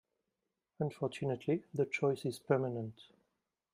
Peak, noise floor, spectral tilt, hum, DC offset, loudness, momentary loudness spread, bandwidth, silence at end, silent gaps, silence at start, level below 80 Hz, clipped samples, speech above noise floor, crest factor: -16 dBFS; -88 dBFS; -7 dB/octave; none; under 0.1%; -36 LUFS; 7 LU; 15.5 kHz; 0.7 s; none; 0.8 s; -78 dBFS; under 0.1%; 52 dB; 22 dB